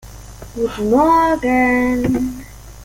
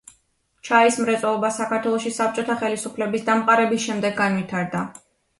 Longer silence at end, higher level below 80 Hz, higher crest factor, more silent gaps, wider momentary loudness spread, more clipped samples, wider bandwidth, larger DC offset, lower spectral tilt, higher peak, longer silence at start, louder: second, 0 s vs 0.4 s; first, -36 dBFS vs -66 dBFS; about the same, 14 dB vs 18 dB; neither; first, 18 LU vs 9 LU; neither; first, 17 kHz vs 11.5 kHz; neither; first, -6 dB/octave vs -4.5 dB/octave; about the same, -2 dBFS vs -4 dBFS; second, 0.05 s vs 0.65 s; first, -16 LUFS vs -21 LUFS